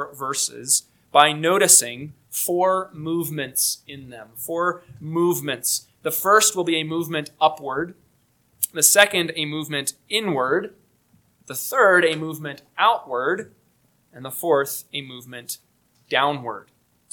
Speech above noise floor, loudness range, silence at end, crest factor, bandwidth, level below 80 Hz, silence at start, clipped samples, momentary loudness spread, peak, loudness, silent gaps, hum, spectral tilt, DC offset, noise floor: 41 dB; 6 LU; 0.5 s; 22 dB; 19 kHz; -68 dBFS; 0 s; under 0.1%; 18 LU; 0 dBFS; -20 LUFS; none; none; -2 dB/octave; under 0.1%; -63 dBFS